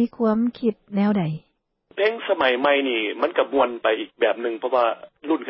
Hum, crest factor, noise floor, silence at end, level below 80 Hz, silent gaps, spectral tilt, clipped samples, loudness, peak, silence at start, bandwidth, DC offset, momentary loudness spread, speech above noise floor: none; 16 dB; -60 dBFS; 0 s; -64 dBFS; none; -10.5 dB/octave; under 0.1%; -22 LUFS; -6 dBFS; 0 s; 5.8 kHz; under 0.1%; 7 LU; 38 dB